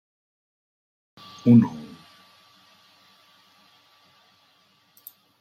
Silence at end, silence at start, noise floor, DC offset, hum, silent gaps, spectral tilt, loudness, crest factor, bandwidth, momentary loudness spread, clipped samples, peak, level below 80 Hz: 3.6 s; 1.45 s; -62 dBFS; under 0.1%; none; none; -9 dB/octave; -19 LUFS; 22 dB; 15 kHz; 29 LU; under 0.1%; -6 dBFS; -68 dBFS